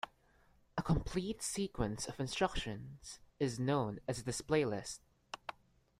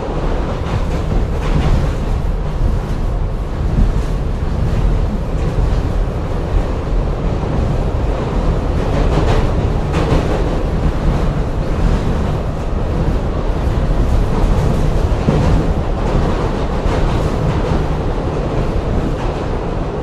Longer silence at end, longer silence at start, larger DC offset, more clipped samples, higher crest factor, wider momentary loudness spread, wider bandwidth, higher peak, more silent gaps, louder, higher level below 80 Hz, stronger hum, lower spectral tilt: first, 0.5 s vs 0 s; about the same, 0.05 s vs 0 s; neither; neither; first, 20 dB vs 14 dB; first, 15 LU vs 5 LU; first, 15.5 kHz vs 10 kHz; second, -18 dBFS vs 0 dBFS; neither; second, -38 LUFS vs -18 LUFS; second, -54 dBFS vs -18 dBFS; neither; second, -5 dB/octave vs -7.5 dB/octave